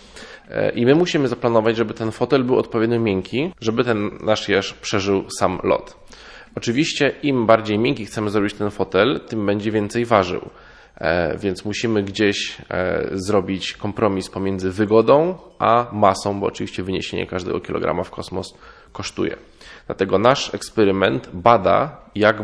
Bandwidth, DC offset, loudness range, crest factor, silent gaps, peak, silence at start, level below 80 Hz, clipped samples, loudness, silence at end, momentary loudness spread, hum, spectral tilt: 11 kHz; under 0.1%; 4 LU; 20 dB; none; 0 dBFS; 0.15 s; -50 dBFS; under 0.1%; -20 LUFS; 0 s; 10 LU; none; -5.5 dB/octave